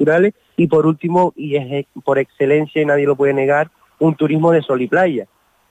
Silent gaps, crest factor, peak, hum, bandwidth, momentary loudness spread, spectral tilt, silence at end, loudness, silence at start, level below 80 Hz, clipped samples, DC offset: none; 12 dB; -4 dBFS; none; 9 kHz; 6 LU; -8.5 dB/octave; 0.45 s; -16 LUFS; 0 s; -58 dBFS; under 0.1%; under 0.1%